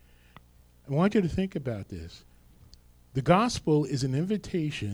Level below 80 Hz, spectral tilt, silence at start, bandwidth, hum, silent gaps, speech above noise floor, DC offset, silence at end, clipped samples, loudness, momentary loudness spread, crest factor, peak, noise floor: -50 dBFS; -6.5 dB/octave; 0.85 s; 13.5 kHz; 60 Hz at -55 dBFS; none; 30 dB; under 0.1%; 0 s; under 0.1%; -28 LUFS; 14 LU; 20 dB; -8 dBFS; -57 dBFS